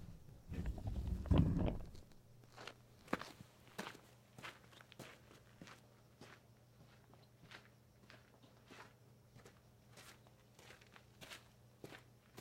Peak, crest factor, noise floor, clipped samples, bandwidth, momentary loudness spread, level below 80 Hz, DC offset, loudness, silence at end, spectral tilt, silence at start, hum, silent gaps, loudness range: -20 dBFS; 28 dB; -66 dBFS; under 0.1%; 16 kHz; 22 LU; -52 dBFS; under 0.1%; -45 LUFS; 0 s; -7 dB/octave; 0 s; none; none; 20 LU